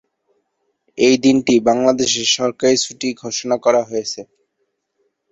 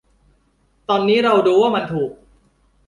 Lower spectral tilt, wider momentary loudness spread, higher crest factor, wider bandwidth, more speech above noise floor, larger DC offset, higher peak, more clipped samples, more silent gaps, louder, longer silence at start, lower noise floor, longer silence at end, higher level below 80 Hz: second, -3 dB/octave vs -6.5 dB/octave; about the same, 11 LU vs 12 LU; about the same, 16 dB vs 16 dB; second, 8 kHz vs 11 kHz; first, 55 dB vs 45 dB; neither; about the same, -2 dBFS vs -2 dBFS; neither; neither; about the same, -16 LUFS vs -17 LUFS; about the same, 0.95 s vs 0.9 s; first, -71 dBFS vs -61 dBFS; first, 1.1 s vs 0.75 s; about the same, -58 dBFS vs -56 dBFS